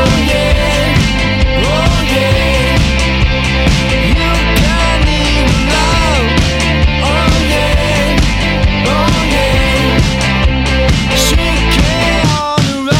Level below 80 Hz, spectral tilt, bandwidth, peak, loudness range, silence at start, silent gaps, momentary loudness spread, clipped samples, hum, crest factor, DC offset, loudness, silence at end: -16 dBFS; -4.5 dB/octave; 16 kHz; 0 dBFS; 0 LU; 0 s; none; 1 LU; under 0.1%; none; 10 dB; under 0.1%; -11 LUFS; 0 s